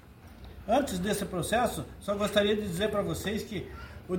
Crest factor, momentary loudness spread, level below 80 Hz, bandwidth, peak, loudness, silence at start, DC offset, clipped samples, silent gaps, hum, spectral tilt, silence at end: 20 dB; 17 LU; -50 dBFS; 19 kHz; -10 dBFS; -30 LUFS; 0.05 s; under 0.1%; under 0.1%; none; none; -4.5 dB/octave; 0 s